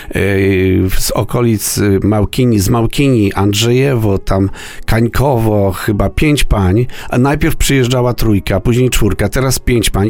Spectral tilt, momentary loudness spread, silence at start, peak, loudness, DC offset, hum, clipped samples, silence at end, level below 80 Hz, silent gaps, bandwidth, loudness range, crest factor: -5.5 dB/octave; 3 LU; 0 s; 0 dBFS; -13 LUFS; under 0.1%; none; under 0.1%; 0 s; -22 dBFS; none; 18 kHz; 1 LU; 10 dB